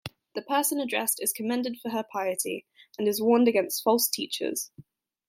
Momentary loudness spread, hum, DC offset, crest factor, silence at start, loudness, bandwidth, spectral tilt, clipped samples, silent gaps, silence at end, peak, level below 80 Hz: 13 LU; none; under 0.1%; 20 dB; 0.05 s; -27 LUFS; 16.5 kHz; -2.5 dB/octave; under 0.1%; none; 0.45 s; -8 dBFS; -72 dBFS